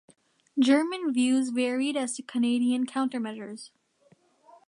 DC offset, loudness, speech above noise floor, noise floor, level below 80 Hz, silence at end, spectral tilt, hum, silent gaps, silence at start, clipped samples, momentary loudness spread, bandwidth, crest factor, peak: under 0.1%; -27 LUFS; 38 dB; -64 dBFS; -82 dBFS; 1 s; -3.5 dB/octave; none; none; 0.55 s; under 0.1%; 13 LU; 11 kHz; 18 dB; -10 dBFS